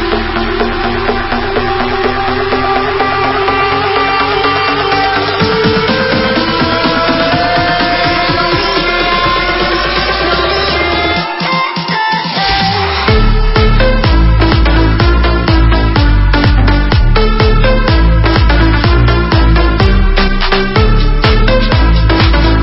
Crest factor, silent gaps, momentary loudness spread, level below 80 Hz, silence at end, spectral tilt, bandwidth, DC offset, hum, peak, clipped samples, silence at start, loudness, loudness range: 10 dB; none; 4 LU; -14 dBFS; 0 s; -8.5 dB/octave; 5.8 kHz; under 0.1%; none; 0 dBFS; under 0.1%; 0 s; -11 LUFS; 2 LU